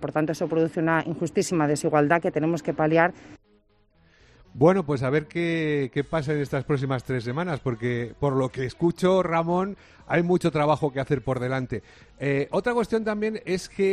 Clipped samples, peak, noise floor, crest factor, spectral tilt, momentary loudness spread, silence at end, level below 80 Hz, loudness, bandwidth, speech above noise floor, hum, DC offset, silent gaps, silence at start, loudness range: under 0.1%; -6 dBFS; -62 dBFS; 20 dB; -6.5 dB/octave; 7 LU; 0 s; -54 dBFS; -25 LUFS; 13 kHz; 38 dB; none; under 0.1%; none; 0 s; 3 LU